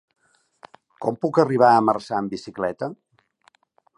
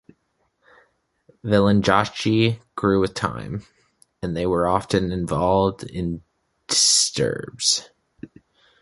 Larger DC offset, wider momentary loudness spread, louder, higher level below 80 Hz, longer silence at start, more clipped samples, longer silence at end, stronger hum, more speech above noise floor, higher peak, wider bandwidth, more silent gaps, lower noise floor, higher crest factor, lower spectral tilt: neither; about the same, 15 LU vs 13 LU; about the same, -21 LUFS vs -21 LUFS; second, -66 dBFS vs -46 dBFS; second, 1 s vs 1.45 s; neither; first, 1.05 s vs 0.55 s; neither; second, 41 dB vs 49 dB; about the same, -2 dBFS vs -2 dBFS; about the same, 11.5 kHz vs 11.5 kHz; neither; second, -61 dBFS vs -70 dBFS; about the same, 20 dB vs 20 dB; first, -7 dB/octave vs -4 dB/octave